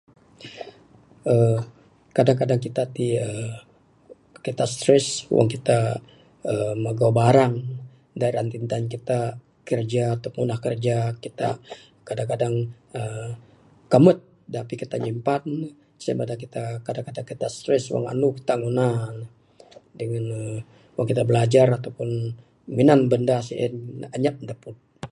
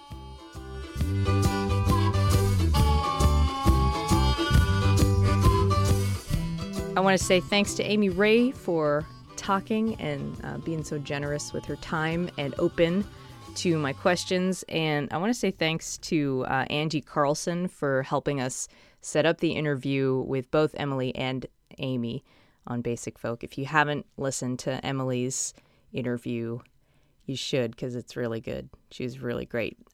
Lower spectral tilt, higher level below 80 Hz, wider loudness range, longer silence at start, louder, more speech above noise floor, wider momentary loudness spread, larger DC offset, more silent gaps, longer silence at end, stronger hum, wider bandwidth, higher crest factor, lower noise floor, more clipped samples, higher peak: about the same, -6.5 dB/octave vs -5.5 dB/octave; second, -60 dBFS vs -36 dBFS; about the same, 6 LU vs 8 LU; first, 0.4 s vs 0 s; first, -23 LUFS vs -27 LUFS; second, 30 dB vs 35 dB; first, 18 LU vs 13 LU; neither; neither; second, 0.05 s vs 0.25 s; neither; second, 11.5 kHz vs 16.5 kHz; about the same, 22 dB vs 20 dB; second, -52 dBFS vs -63 dBFS; neither; first, -2 dBFS vs -6 dBFS